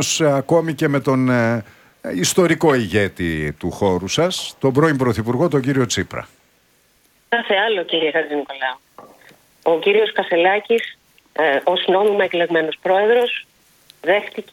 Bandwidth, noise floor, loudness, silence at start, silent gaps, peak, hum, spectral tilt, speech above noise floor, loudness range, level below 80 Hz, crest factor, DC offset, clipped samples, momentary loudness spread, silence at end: 17 kHz; -58 dBFS; -18 LUFS; 0 s; none; -2 dBFS; none; -4.5 dB/octave; 40 dB; 3 LU; -50 dBFS; 16 dB; under 0.1%; under 0.1%; 9 LU; 0.1 s